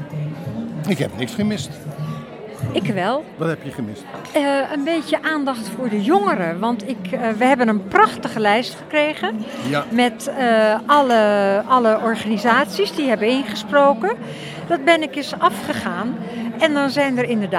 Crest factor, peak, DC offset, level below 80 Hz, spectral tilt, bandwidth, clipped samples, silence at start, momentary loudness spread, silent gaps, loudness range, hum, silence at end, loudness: 20 dB; 0 dBFS; under 0.1%; -60 dBFS; -5.5 dB/octave; 16 kHz; under 0.1%; 0 s; 12 LU; none; 7 LU; none; 0 s; -19 LUFS